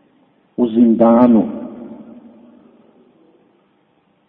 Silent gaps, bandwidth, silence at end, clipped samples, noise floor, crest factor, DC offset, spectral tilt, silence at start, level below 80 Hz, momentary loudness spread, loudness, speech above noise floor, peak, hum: none; 3.7 kHz; 2.3 s; under 0.1%; -59 dBFS; 18 dB; under 0.1%; -11.5 dB/octave; 0.6 s; -56 dBFS; 24 LU; -13 LUFS; 48 dB; 0 dBFS; none